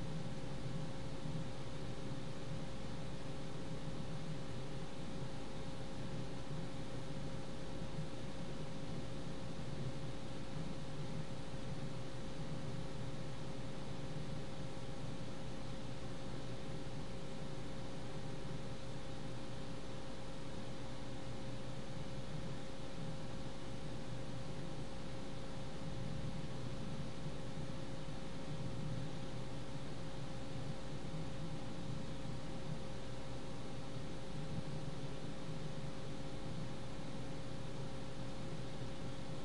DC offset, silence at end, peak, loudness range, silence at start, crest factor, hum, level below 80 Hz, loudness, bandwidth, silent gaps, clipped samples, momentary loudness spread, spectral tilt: 1%; 0 s; -30 dBFS; 1 LU; 0 s; 16 dB; none; -56 dBFS; -47 LUFS; 11.5 kHz; none; under 0.1%; 3 LU; -6 dB/octave